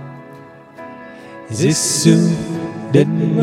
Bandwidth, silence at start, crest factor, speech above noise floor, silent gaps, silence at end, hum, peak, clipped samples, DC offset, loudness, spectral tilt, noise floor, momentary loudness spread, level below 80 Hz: 15.5 kHz; 0 s; 18 dB; 25 dB; none; 0 s; none; 0 dBFS; under 0.1%; under 0.1%; -15 LUFS; -5 dB/octave; -39 dBFS; 23 LU; -52 dBFS